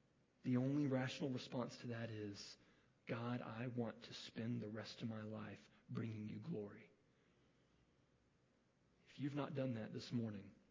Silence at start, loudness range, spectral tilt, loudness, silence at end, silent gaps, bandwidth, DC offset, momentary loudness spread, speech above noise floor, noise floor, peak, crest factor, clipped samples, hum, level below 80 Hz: 0.45 s; 9 LU; -7 dB/octave; -47 LUFS; 0.15 s; none; 7.6 kHz; under 0.1%; 14 LU; 33 dB; -78 dBFS; -28 dBFS; 20 dB; under 0.1%; none; -82 dBFS